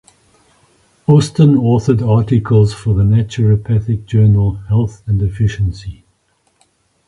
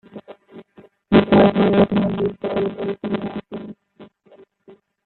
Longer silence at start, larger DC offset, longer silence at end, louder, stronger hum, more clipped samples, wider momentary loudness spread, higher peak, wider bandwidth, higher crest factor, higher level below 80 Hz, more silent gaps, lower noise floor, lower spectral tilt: first, 1.1 s vs 0.15 s; neither; first, 1.15 s vs 0.35 s; first, -14 LUFS vs -18 LUFS; neither; neither; second, 7 LU vs 20 LU; about the same, 0 dBFS vs -2 dBFS; first, 11 kHz vs 4.3 kHz; about the same, 14 dB vs 18 dB; first, -32 dBFS vs -50 dBFS; neither; first, -60 dBFS vs -51 dBFS; second, -8.5 dB/octave vs -10.5 dB/octave